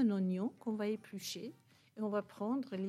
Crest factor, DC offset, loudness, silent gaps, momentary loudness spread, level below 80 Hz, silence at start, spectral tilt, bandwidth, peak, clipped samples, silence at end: 14 dB; under 0.1%; -39 LUFS; none; 10 LU; -90 dBFS; 0 s; -6 dB/octave; 15.5 kHz; -24 dBFS; under 0.1%; 0 s